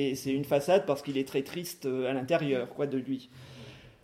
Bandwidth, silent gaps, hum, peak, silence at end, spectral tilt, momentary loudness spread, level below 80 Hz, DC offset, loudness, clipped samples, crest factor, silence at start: 16 kHz; none; none; -12 dBFS; 0.15 s; -5.5 dB/octave; 22 LU; -68 dBFS; under 0.1%; -31 LUFS; under 0.1%; 20 dB; 0 s